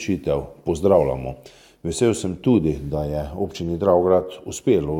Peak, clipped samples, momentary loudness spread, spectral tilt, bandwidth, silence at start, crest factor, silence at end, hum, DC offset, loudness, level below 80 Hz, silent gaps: -2 dBFS; under 0.1%; 12 LU; -6.5 dB/octave; 16 kHz; 0 s; 18 dB; 0 s; none; under 0.1%; -21 LUFS; -40 dBFS; none